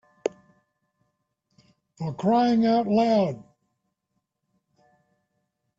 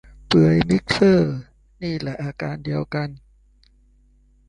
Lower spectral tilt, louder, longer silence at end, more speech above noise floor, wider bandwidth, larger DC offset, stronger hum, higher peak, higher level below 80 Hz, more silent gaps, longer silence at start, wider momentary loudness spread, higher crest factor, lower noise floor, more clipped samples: about the same, -7.5 dB/octave vs -7 dB/octave; second, -23 LUFS vs -20 LUFS; first, 2.35 s vs 1.3 s; first, 57 dB vs 37 dB; second, 7.6 kHz vs 10.5 kHz; neither; neither; second, -8 dBFS vs -4 dBFS; second, -68 dBFS vs -46 dBFS; neither; about the same, 0.25 s vs 0.3 s; about the same, 14 LU vs 13 LU; about the same, 20 dB vs 18 dB; first, -79 dBFS vs -56 dBFS; neither